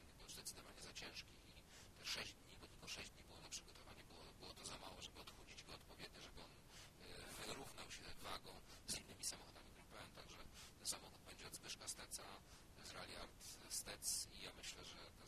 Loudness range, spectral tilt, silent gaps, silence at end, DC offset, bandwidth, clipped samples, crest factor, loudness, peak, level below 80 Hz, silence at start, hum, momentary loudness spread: 6 LU; -1.5 dB/octave; none; 0 s; under 0.1%; 16 kHz; under 0.1%; 24 dB; -53 LUFS; -30 dBFS; -68 dBFS; 0 s; none; 13 LU